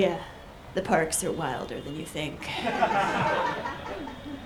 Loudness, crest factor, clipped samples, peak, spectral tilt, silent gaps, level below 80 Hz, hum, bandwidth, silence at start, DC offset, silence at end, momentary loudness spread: -29 LUFS; 20 dB; under 0.1%; -10 dBFS; -4 dB/octave; none; -52 dBFS; none; over 20 kHz; 0 s; under 0.1%; 0 s; 12 LU